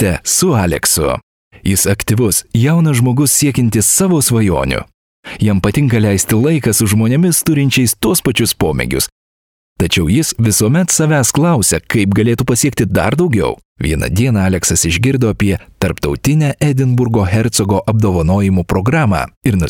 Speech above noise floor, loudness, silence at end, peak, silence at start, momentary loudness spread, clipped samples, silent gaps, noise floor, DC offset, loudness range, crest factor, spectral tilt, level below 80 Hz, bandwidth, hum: over 78 dB; -13 LUFS; 0 s; 0 dBFS; 0 s; 5 LU; under 0.1%; 1.23-1.51 s, 4.94-5.23 s, 9.12-9.76 s, 13.65-13.76 s, 19.37-19.41 s; under -90 dBFS; under 0.1%; 2 LU; 12 dB; -4.5 dB/octave; -32 dBFS; 20 kHz; none